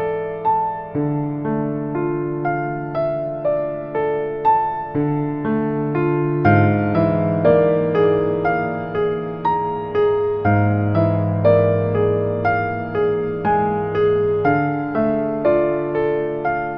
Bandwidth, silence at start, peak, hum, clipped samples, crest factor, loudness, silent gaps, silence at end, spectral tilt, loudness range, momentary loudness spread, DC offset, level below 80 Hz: 5.4 kHz; 0 s; -2 dBFS; none; under 0.1%; 16 dB; -19 LUFS; none; 0 s; -11 dB/octave; 5 LU; 7 LU; under 0.1%; -46 dBFS